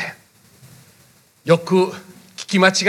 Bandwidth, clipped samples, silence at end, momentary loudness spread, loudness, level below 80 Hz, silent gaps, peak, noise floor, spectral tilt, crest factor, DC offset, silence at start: 14.5 kHz; under 0.1%; 0 s; 21 LU; -18 LUFS; -70 dBFS; none; 0 dBFS; -53 dBFS; -4.5 dB/octave; 20 dB; under 0.1%; 0 s